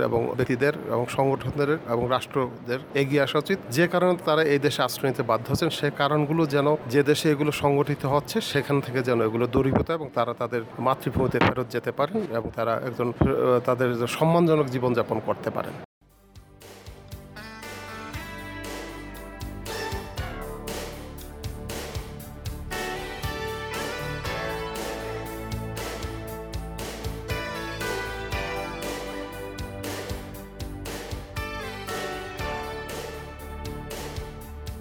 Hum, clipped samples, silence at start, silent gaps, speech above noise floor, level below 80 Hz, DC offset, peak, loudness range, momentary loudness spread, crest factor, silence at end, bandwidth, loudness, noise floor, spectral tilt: none; under 0.1%; 0 s; 15.85-16.01 s; 27 dB; -44 dBFS; under 0.1%; -8 dBFS; 12 LU; 15 LU; 20 dB; 0 s; over 20 kHz; -27 LUFS; -51 dBFS; -5.5 dB/octave